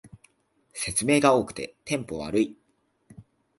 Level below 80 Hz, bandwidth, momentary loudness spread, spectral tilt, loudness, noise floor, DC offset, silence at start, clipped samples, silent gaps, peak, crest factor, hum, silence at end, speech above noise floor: -56 dBFS; 12 kHz; 15 LU; -4 dB/octave; -25 LUFS; -70 dBFS; under 0.1%; 0.05 s; under 0.1%; none; -6 dBFS; 22 dB; none; 0.4 s; 45 dB